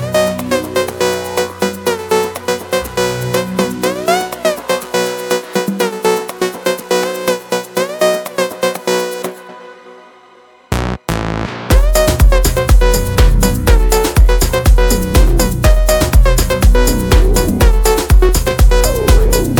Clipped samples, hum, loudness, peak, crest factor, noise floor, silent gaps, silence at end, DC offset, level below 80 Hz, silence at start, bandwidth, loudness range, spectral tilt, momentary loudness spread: under 0.1%; none; -14 LUFS; 0 dBFS; 12 dB; -44 dBFS; none; 0 s; under 0.1%; -14 dBFS; 0 s; 19 kHz; 7 LU; -5 dB/octave; 7 LU